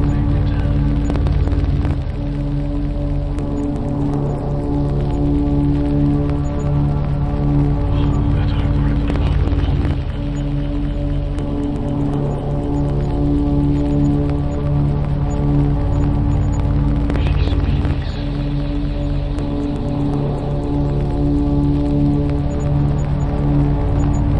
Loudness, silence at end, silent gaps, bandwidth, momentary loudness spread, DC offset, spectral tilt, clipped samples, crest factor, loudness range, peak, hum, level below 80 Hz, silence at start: -19 LUFS; 0 s; none; 7.4 kHz; 5 LU; under 0.1%; -9 dB/octave; under 0.1%; 14 dB; 3 LU; -4 dBFS; none; -22 dBFS; 0 s